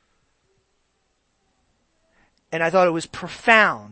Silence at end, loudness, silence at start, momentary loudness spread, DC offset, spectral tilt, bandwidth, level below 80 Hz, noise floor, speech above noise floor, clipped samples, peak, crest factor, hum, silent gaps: 0.05 s; -19 LUFS; 2.5 s; 16 LU; under 0.1%; -4.5 dB/octave; 8.8 kHz; -60 dBFS; -69 dBFS; 50 dB; under 0.1%; 0 dBFS; 24 dB; none; none